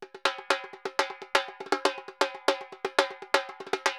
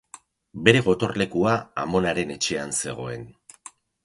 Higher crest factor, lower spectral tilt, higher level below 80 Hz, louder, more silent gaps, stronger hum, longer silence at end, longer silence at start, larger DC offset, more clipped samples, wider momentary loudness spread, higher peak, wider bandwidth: about the same, 26 dB vs 24 dB; second, -0.5 dB/octave vs -4.5 dB/octave; second, under -90 dBFS vs -52 dBFS; second, -29 LUFS vs -23 LUFS; neither; neither; second, 0 s vs 0.75 s; second, 0 s vs 0.55 s; neither; neither; second, 4 LU vs 23 LU; second, -4 dBFS vs 0 dBFS; first, 18.5 kHz vs 11.5 kHz